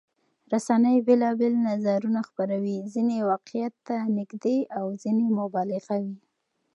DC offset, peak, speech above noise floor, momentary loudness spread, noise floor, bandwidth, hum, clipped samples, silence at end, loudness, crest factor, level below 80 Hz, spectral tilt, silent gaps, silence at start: under 0.1%; -10 dBFS; 51 dB; 10 LU; -75 dBFS; 11 kHz; none; under 0.1%; 0.6 s; -26 LUFS; 16 dB; -82 dBFS; -7.5 dB/octave; none; 0.5 s